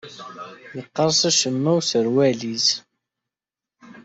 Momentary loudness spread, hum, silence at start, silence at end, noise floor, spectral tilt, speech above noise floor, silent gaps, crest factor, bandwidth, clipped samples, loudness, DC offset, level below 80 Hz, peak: 20 LU; none; 0.05 s; 0.05 s; -89 dBFS; -3.5 dB/octave; 68 dB; none; 16 dB; 8.2 kHz; under 0.1%; -19 LUFS; under 0.1%; -66 dBFS; -6 dBFS